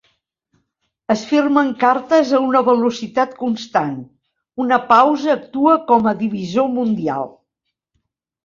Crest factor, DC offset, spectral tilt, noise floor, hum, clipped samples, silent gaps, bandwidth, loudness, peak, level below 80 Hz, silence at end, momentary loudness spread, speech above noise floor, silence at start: 16 dB; under 0.1%; -6 dB/octave; -78 dBFS; none; under 0.1%; none; 7.4 kHz; -17 LUFS; -2 dBFS; -62 dBFS; 1.15 s; 11 LU; 62 dB; 1.1 s